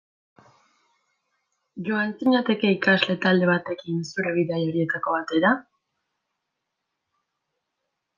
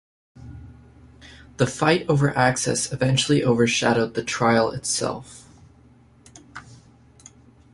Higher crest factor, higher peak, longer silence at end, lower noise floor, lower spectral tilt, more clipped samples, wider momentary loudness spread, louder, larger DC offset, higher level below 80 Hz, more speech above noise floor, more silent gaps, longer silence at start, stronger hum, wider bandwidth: about the same, 22 dB vs 20 dB; about the same, -4 dBFS vs -4 dBFS; first, 2.55 s vs 1 s; first, -81 dBFS vs -53 dBFS; first, -6.5 dB/octave vs -4.5 dB/octave; neither; second, 9 LU vs 23 LU; about the same, -23 LUFS vs -21 LUFS; neither; second, -72 dBFS vs -52 dBFS; first, 58 dB vs 32 dB; neither; first, 1.75 s vs 0.4 s; neither; second, 7.4 kHz vs 11.5 kHz